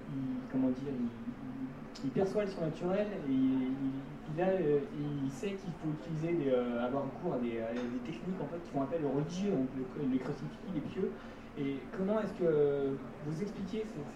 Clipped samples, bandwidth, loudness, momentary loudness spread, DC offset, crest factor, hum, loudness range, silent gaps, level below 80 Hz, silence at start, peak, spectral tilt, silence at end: under 0.1%; 9.4 kHz; -36 LUFS; 9 LU; under 0.1%; 16 dB; none; 2 LU; none; -58 dBFS; 0 s; -20 dBFS; -8 dB/octave; 0 s